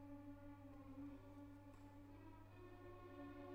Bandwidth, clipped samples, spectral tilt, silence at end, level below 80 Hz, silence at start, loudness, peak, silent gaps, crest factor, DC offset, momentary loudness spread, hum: 15.5 kHz; under 0.1%; -8 dB/octave; 0 s; -68 dBFS; 0 s; -60 LUFS; -46 dBFS; none; 14 dB; under 0.1%; 5 LU; 50 Hz at -65 dBFS